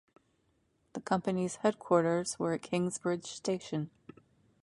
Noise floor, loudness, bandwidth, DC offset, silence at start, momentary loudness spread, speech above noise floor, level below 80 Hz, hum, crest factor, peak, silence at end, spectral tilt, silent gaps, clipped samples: -74 dBFS; -33 LUFS; 11.5 kHz; under 0.1%; 0.95 s; 10 LU; 42 dB; -72 dBFS; none; 22 dB; -12 dBFS; 0.75 s; -5.5 dB/octave; none; under 0.1%